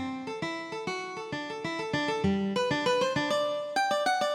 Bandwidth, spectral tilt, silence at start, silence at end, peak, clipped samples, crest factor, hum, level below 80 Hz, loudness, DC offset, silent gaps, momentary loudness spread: 16.5 kHz; -4.5 dB/octave; 0 s; 0 s; -16 dBFS; under 0.1%; 14 dB; none; -62 dBFS; -30 LUFS; under 0.1%; none; 9 LU